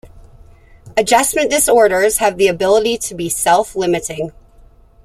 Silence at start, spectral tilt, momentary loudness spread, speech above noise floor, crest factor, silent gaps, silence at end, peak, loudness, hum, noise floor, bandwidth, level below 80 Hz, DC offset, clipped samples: 0.05 s; -2.5 dB/octave; 10 LU; 31 dB; 14 dB; none; 0.75 s; 0 dBFS; -14 LUFS; none; -45 dBFS; 16 kHz; -44 dBFS; under 0.1%; under 0.1%